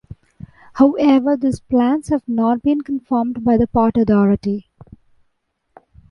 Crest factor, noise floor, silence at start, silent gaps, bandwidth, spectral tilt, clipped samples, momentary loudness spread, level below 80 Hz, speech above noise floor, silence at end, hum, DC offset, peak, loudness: 16 dB; -69 dBFS; 0.75 s; none; 11.5 kHz; -8 dB/octave; under 0.1%; 7 LU; -44 dBFS; 53 dB; 1.5 s; none; under 0.1%; -2 dBFS; -17 LUFS